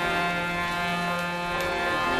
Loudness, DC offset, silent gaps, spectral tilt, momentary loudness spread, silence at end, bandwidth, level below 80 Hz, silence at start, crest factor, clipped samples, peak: -26 LUFS; under 0.1%; none; -4 dB/octave; 2 LU; 0 s; 13.5 kHz; -48 dBFS; 0 s; 14 dB; under 0.1%; -14 dBFS